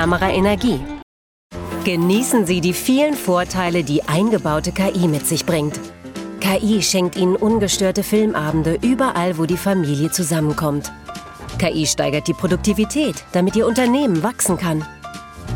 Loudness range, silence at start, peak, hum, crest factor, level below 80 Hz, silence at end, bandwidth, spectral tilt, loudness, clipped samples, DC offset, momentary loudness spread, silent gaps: 2 LU; 0 s; -2 dBFS; none; 16 dB; -40 dBFS; 0 s; 18 kHz; -5 dB/octave; -18 LUFS; under 0.1%; under 0.1%; 15 LU; 1.03-1.50 s